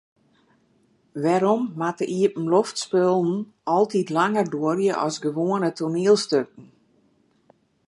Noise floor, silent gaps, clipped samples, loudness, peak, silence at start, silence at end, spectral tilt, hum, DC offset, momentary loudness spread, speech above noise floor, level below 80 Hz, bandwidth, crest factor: -63 dBFS; none; under 0.1%; -22 LUFS; -6 dBFS; 1.15 s; 1.25 s; -5.5 dB/octave; none; under 0.1%; 6 LU; 41 dB; -74 dBFS; 11.5 kHz; 18 dB